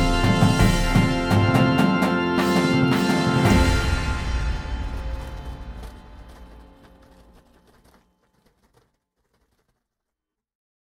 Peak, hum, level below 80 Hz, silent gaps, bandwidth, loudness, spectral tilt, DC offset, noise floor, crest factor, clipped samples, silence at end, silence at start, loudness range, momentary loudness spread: -4 dBFS; none; -30 dBFS; none; 19.5 kHz; -20 LUFS; -6 dB/octave; under 0.1%; -85 dBFS; 20 dB; under 0.1%; 4.3 s; 0 s; 19 LU; 18 LU